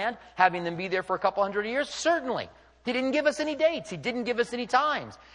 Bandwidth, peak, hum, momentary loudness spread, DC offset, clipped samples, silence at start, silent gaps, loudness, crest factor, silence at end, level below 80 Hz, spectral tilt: 11 kHz; -6 dBFS; none; 8 LU; under 0.1%; under 0.1%; 0 s; none; -28 LUFS; 22 dB; 0.2 s; -64 dBFS; -4 dB/octave